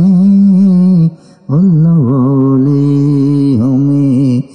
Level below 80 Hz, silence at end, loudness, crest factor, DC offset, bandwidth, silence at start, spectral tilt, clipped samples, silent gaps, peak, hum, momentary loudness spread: -52 dBFS; 0.1 s; -9 LUFS; 6 dB; under 0.1%; 5.6 kHz; 0 s; -11 dB/octave; under 0.1%; none; -2 dBFS; none; 4 LU